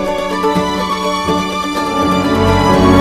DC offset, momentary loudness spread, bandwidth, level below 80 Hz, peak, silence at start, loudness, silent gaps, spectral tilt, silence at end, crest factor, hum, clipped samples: under 0.1%; 6 LU; 14.5 kHz; -30 dBFS; 0 dBFS; 0 s; -14 LUFS; none; -5.5 dB/octave; 0 s; 12 dB; none; under 0.1%